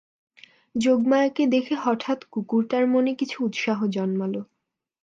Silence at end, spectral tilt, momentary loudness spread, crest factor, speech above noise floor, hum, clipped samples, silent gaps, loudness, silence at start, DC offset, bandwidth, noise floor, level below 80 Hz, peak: 0.6 s; -6 dB/octave; 8 LU; 16 dB; 58 dB; none; under 0.1%; none; -24 LUFS; 0.75 s; under 0.1%; 7.8 kHz; -81 dBFS; -72 dBFS; -8 dBFS